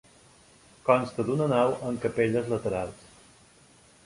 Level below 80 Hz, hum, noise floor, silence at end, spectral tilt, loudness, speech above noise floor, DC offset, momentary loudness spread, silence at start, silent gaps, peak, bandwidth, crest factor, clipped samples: -58 dBFS; none; -57 dBFS; 1.1 s; -7 dB/octave; -27 LUFS; 31 dB; under 0.1%; 8 LU; 0.85 s; none; -6 dBFS; 11.5 kHz; 24 dB; under 0.1%